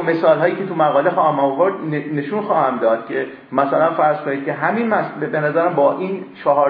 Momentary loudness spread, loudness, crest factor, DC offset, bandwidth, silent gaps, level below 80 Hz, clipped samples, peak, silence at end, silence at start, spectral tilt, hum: 7 LU; -18 LUFS; 16 dB; under 0.1%; 5.2 kHz; none; -70 dBFS; under 0.1%; -2 dBFS; 0 s; 0 s; -10 dB/octave; none